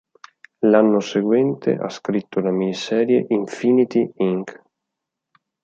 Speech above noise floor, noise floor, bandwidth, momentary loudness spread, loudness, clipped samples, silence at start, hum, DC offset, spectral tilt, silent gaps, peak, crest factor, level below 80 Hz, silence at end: 63 dB; -82 dBFS; 7.8 kHz; 8 LU; -19 LUFS; under 0.1%; 0.6 s; none; under 0.1%; -6.5 dB/octave; none; -2 dBFS; 18 dB; -70 dBFS; 1.1 s